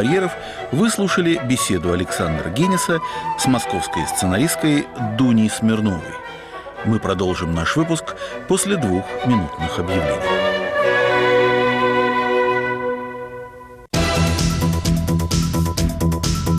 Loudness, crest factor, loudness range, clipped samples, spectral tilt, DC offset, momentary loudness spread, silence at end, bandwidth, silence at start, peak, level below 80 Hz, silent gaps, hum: -19 LUFS; 12 dB; 3 LU; under 0.1%; -5 dB/octave; under 0.1%; 8 LU; 0 s; 15.5 kHz; 0 s; -8 dBFS; -34 dBFS; none; none